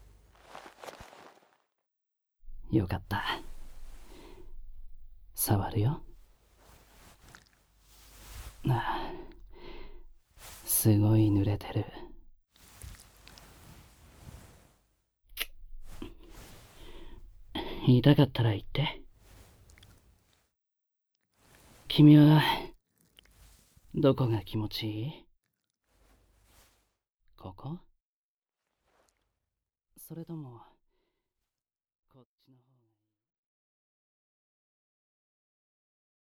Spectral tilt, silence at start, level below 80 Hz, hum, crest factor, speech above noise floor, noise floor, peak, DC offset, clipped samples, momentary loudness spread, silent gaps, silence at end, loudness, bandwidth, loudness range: -6 dB/octave; 0.55 s; -50 dBFS; none; 24 dB; over 64 dB; under -90 dBFS; -8 dBFS; under 0.1%; under 0.1%; 28 LU; 27.14-27.18 s, 28.02-28.42 s; 5.7 s; -27 LUFS; 19 kHz; 24 LU